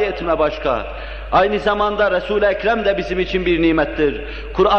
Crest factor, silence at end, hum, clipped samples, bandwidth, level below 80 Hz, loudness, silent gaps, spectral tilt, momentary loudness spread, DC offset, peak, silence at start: 14 dB; 0 s; none; under 0.1%; 6.8 kHz; -32 dBFS; -18 LUFS; none; -6.5 dB/octave; 7 LU; 0.4%; -2 dBFS; 0 s